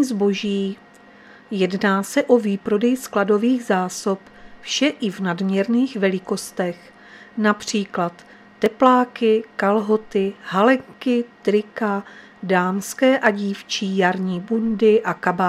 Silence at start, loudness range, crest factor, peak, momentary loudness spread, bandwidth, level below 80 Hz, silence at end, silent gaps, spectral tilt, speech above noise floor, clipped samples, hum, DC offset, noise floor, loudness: 0 s; 3 LU; 20 dB; 0 dBFS; 9 LU; 14.5 kHz; -62 dBFS; 0 s; none; -5 dB/octave; 27 dB; under 0.1%; none; under 0.1%; -46 dBFS; -20 LUFS